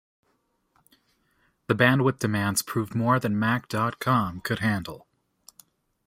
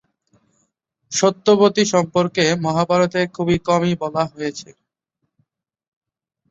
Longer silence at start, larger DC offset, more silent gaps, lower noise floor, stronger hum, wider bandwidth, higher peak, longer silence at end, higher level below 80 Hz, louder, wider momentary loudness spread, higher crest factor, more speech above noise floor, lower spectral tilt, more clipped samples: first, 1.7 s vs 1.1 s; neither; neither; second, -72 dBFS vs -76 dBFS; neither; first, 16 kHz vs 8 kHz; about the same, -4 dBFS vs -2 dBFS; second, 1.1 s vs 1.85 s; second, -60 dBFS vs -54 dBFS; second, -25 LUFS vs -18 LUFS; about the same, 9 LU vs 9 LU; about the same, 22 dB vs 18 dB; second, 47 dB vs 58 dB; about the same, -5.5 dB/octave vs -5 dB/octave; neither